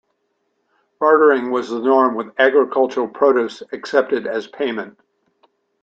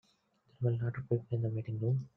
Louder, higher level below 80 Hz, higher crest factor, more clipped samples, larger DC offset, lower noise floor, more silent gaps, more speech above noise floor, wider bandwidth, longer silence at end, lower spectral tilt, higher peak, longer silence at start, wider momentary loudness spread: first, -17 LUFS vs -35 LUFS; about the same, -70 dBFS vs -68 dBFS; about the same, 16 dB vs 16 dB; neither; neither; about the same, -69 dBFS vs -72 dBFS; neither; first, 52 dB vs 38 dB; first, 7.8 kHz vs 3.2 kHz; first, 0.95 s vs 0.1 s; second, -5 dB/octave vs -11 dB/octave; first, -2 dBFS vs -18 dBFS; first, 1 s vs 0.6 s; first, 12 LU vs 3 LU